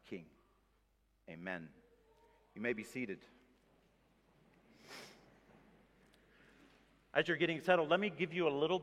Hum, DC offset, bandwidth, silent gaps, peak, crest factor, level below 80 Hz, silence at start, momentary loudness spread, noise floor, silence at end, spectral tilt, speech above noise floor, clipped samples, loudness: none; under 0.1%; 14.5 kHz; none; -16 dBFS; 26 dB; -78 dBFS; 0.05 s; 22 LU; -76 dBFS; 0 s; -5.5 dB/octave; 39 dB; under 0.1%; -37 LUFS